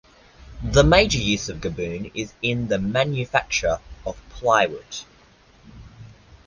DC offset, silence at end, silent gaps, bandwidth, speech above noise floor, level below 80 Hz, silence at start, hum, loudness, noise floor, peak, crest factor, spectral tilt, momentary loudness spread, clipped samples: under 0.1%; 0.35 s; none; 10 kHz; 32 dB; -36 dBFS; 0.4 s; none; -21 LUFS; -53 dBFS; -2 dBFS; 22 dB; -4.5 dB/octave; 18 LU; under 0.1%